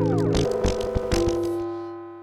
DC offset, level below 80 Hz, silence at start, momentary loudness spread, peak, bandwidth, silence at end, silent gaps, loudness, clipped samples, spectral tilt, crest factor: under 0.1%; -34 dBFS; 0 s; 10 LU; -10 dBFS; 14.5 kHz; 0 s; none; -25 LUFS; under 0.1%; -6.5 dB/octave; 14 dB